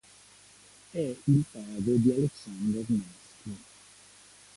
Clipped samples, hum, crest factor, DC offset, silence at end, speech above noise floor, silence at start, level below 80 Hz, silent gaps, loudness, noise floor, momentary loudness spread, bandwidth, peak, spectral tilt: under 0.1%; 50 Hz at -55 dBFS; 18 dB; under 0.1%; 0.95 s; 28 dB; 0.95 s; -62 dBFS; none; -29 LUFS; -56 dBFS; 19 LU; 11.5 kHz; -12 dBFS; -8 dB/octave